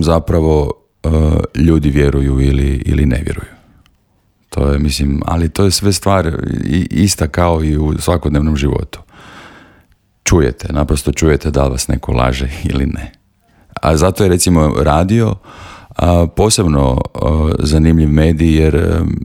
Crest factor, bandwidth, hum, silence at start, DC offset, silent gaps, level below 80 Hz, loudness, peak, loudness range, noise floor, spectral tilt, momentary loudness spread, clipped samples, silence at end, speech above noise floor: 12 dB; 17 kHz; none; 0 s; under 0.1%; none; -22 dBFS; -13 LUFS; 0 dBFS; 4 LU; -57 dBFS; -6 dB/octave; 8 LU; under 0.1%; 0 s; 44 dB